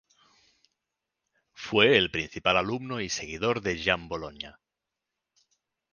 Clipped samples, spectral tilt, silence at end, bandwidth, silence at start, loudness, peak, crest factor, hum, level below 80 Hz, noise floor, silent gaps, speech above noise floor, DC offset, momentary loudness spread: under 0.1%; -3.5 dB/octave; 1.4 s; 10 kHz; 1.6 s; -26 LUFS; -4 dBFS; 26 dB; none; -56 dBFS; -87 dBFS; none; 60 dB; under 0.1%; 19 LU